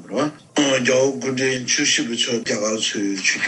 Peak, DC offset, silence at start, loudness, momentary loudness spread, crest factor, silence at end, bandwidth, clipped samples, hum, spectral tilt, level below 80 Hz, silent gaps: -4 dBFS; under 0.1%; 0 s; -19 LUFS; 5 LU; 16 dB; 0 s; 11.5 kHz; under 0.1%; none; -2.5 dB/octave; -68 dBFS; none